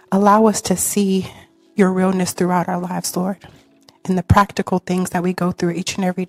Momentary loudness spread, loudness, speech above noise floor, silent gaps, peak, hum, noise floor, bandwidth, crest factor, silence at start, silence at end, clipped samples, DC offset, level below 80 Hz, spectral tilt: 9 LU; -18 LUFS; 27 dB; none; 0 dBFS; none; -44 dBFS; 16 kHz; 18 dB; 0.1 s; 0 s; under 0.1%; under 0.1%; -40 dBFS; -5.5 dB/octave